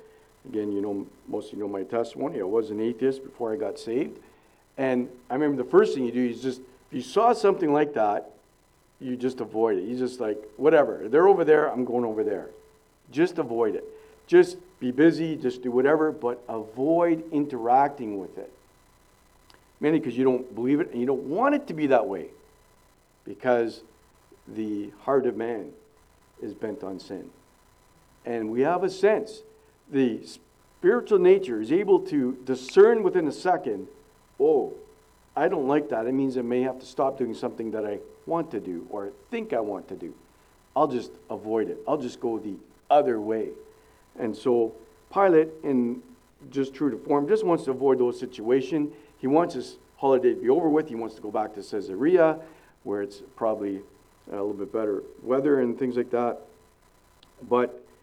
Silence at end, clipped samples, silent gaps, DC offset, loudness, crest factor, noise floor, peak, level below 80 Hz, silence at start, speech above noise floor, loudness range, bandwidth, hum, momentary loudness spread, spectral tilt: 0.25 s; under 0.1%; none; under 0.1%; -25 LUFS; 20 dB; -62 dBFS; -6 dBFS; -64 dBFS; 0.45 s; 37 dB; 7 LU; 11 kHz; none; 15 LU; -7 dB/octave